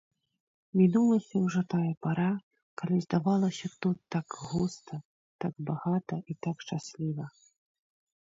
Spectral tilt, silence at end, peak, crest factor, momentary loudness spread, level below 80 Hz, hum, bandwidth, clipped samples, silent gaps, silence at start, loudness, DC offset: -7.5 dB/octave; 1 s; -12 dBFS; 18 dB; 12 LU; -68 dBFS; none; 7.8 kHz; under 0.1%; 1.97-2.01 s, 2.43-2.51 s, 2.63-2.77 s, 5.05-5.39 s; 0.75 s; -31 LUFS; under 0.1%